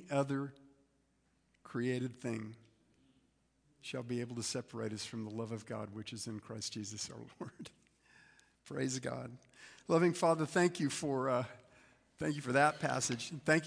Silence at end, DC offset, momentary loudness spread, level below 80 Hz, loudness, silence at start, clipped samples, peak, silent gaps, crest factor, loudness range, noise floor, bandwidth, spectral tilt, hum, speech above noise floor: 0 s; under 0.1%; 17 LU; -76 dBFS; -37 LUFS; 0 s; under 0.1%; -14 dBFS; none; 24 dB; 10 LU; -76 dBFS; 10.5 kHz; -4.5 dB/octave; none; 39 dB